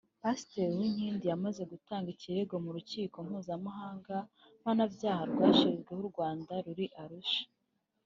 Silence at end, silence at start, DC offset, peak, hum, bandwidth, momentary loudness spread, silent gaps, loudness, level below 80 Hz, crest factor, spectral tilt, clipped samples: 0.6 s; 0.25 s; under 0.1%; -12 dBFS; none; 7.6 kHz; 12 LU; none; -35 LUFS; -74 dBFS; 24 dB; -5 dB/octave; under 0.1%